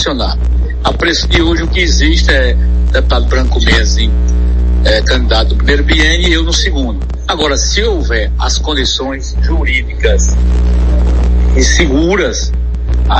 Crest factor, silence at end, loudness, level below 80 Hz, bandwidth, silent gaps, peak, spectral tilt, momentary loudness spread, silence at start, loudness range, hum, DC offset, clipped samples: 10 dB; 0 s; -12 LUFS; -12 dBFS; 8.2 kHz; none; 0 dBFS; -4.5 dB/octave; 6 LU; 0 s; 2 LU; 60 Hz at -10 dBFS; under 0.1%; under 0.1%